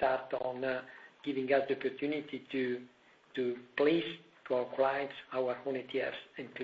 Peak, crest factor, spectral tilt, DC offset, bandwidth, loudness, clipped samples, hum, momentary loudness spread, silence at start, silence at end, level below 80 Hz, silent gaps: -16 dBFS; 18 dB; -7 dB/octave; under 0.1%; 7.2 kHz; -35 LUFS; under 0.1%; none; 12 LU; 0 s; 0 s; -76 dBFS; none